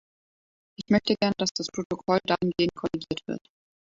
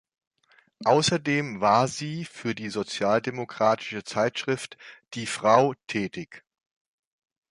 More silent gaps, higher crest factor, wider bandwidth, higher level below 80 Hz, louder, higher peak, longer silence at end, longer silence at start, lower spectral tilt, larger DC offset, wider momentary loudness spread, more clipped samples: first, 1.51-1.55 s, 1.85-1.90 s vs none; about the same, 20 dB vs 24 dB; second, 7.6 kHz vs 11.5 kHz; first, -60 dBFS vs -66 dBFS; about the same, -27 LUFS vs -25 LUFS; second, -8 dBFS vs -2 dBFS; second, 0.6 s vs 1.1 s; about the same, 0.8 s vs 0.8 s; about the same, -5 dB/octave vs -4.5 dB/octave; neither; second, 10 LU vs 13 LU; neither